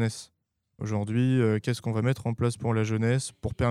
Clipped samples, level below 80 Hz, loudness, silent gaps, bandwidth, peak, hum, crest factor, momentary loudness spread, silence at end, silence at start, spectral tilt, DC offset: under 0.1%; -50 dBFS; -27 LUFS; none; 12.5 kHz; -12 dBFS; none; 16 dB; 8 LU; 0 s; 0 s; -6.5 dB/octave; under 0.1%